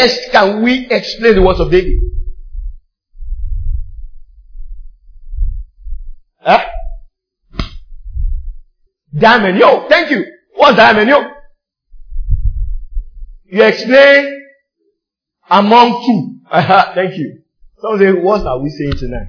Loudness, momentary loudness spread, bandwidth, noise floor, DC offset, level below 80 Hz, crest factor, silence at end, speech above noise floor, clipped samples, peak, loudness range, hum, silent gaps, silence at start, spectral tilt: -11 LUFS; 23 LU; 5.4 kHz; -76 dBFS; under 0.1%; -22 dBFS; 12 dB; 0 s; 66 dB; 0.5%; 0 dBFS; 16 LU; none; none; 0 s; -6 dB/octave